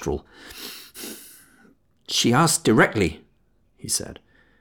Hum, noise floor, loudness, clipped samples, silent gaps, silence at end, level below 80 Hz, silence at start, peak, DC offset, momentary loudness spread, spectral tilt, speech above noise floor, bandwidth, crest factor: none; -64 dBFS; -21 LUFS; under 0.1%; none; 0.45 s; -48 dBFS; 0 s; -4 dBFS; under 0.1%; 21 LU; -3.5 dB/octave; 43 dB; over 20 kHz; 20 dB